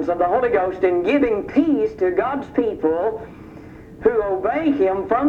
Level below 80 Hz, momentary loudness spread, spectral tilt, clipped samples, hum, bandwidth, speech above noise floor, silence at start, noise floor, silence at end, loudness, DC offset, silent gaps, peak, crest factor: -48 dBFS; 10 LU; -8 dB/octave; under 0.1%; none; 6.8 kHz; 20 dB; 0 s; -39 dBFS; 0 s; -20 LUFS; under 0.1%; none; -4 dBFS; 16 dB